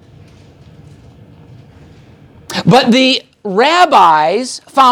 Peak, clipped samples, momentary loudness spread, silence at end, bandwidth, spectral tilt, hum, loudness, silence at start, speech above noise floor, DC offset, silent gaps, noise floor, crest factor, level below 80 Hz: 0 dBFS; under 0.1%; 11 LU; 0 s; 18.5 kHz; -4.5 dB/octave; none; -10 LUFS; 2.5 s; 31 dB; under 0.1%; none; -40 dBFS; 14 dB; -52 dBFS